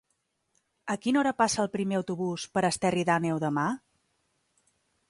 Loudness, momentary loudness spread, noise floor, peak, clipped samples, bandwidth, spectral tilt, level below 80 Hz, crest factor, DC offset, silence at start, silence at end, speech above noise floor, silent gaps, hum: -28 LUFS; 7 LU; -77 dBFS; -10 dBFS; under 0.1%; 11.5 kHz; -5 dB/octave; -66 dBFS; 20 dB; under 0.1%; 0.85 s; 1.35 s; 50 dB; none; none